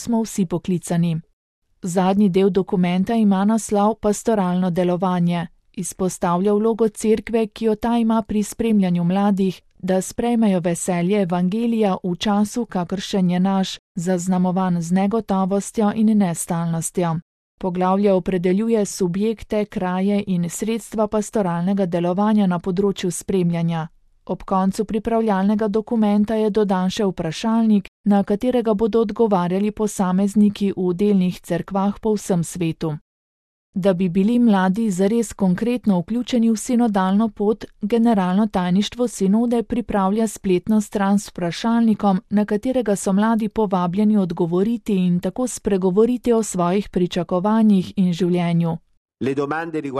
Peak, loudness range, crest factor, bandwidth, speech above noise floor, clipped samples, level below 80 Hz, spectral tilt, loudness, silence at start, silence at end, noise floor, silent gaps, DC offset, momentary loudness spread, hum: -4 dBFS; 2 LU; 16 dB; 13 kHz; over 71 dB; under 0.1%; -48 dBFS; -6.5 dB/octave; -20 LUFS; 0 s; 0 s; under -90 dBFS; 1.33-1.62 s, 13.79-13.95 s, 17.22-17.58 s, 27.88-28.04 s, 33.01-33.73 s, 48.97-49.06 s; under 0.1%; 6 LU; none